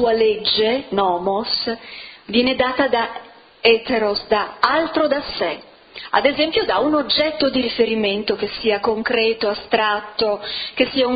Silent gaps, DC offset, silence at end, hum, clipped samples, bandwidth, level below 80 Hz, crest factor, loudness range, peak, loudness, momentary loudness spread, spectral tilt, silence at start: none; under 0.1%; 0 s; none; under 0.1%; 5.2 kHz; -52 dBFS; 20 dB; 1 LU; 0 dBFS; -19 LUFS; 8 LU; -6.5 dB/octave; 0 s